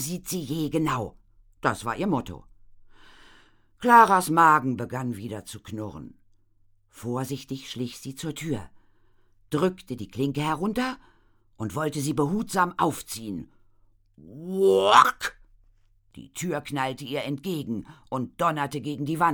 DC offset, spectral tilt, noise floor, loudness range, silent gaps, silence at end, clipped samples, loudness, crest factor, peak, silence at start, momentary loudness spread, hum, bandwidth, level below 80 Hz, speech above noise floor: under 0.1%; -5 dB/octave; -61 dBFS; 12 LU; none; 0 s; under 0.1%; -25 LUFS; 24 dB; -4 dBFS; 0 s; 18 LU; none; over 20 kHz; -56 dBFS; 36 dB